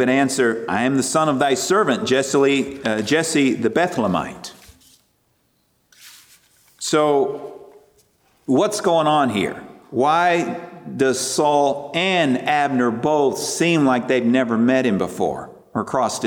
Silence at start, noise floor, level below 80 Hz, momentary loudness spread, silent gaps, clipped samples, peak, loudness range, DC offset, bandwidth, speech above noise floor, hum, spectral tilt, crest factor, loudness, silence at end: 0 s; -64 dBFS; -60 dBFS; 11 LU; none; under 0.1%; -4 dBFS; 7 LU; under 0.1%; 18 kHz; 46 dB; none; -4.5 dB/octave; 14 dB; -19 LUFS; 0 s